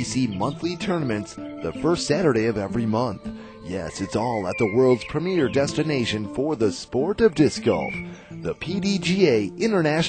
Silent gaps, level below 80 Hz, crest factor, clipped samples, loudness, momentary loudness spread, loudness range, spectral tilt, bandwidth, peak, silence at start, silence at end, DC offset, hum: none; -50 dBFS; 18 dB; under 0.1%; -23 LUFS; 12 LU; 3 LU; -5.5 dB/octave; 9.2 kHz; -4 dBFS; 0 s; 0 s; under 0.1%; none